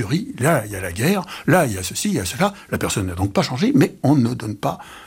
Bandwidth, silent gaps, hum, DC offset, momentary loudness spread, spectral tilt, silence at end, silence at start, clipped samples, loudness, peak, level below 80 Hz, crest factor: 17.5 kHz; none; none; under 0.1%; 8 LU; -5.5 dB/octave; 0 s; 0 s; under 0.1%; -20 LUFS; -4 dBFS; -48 dBFS; 16 dB